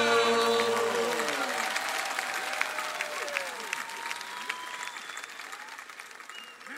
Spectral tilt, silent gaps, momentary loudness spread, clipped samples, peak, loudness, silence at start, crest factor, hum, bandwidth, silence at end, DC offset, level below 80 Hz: -1 dB/octave; none; 17 LU; under 0.1%; -10 dBFS; -30 LUFS; 0 s; 22 dB; none; 16 kHz; 0 s; under 0.1%; -80 dBFS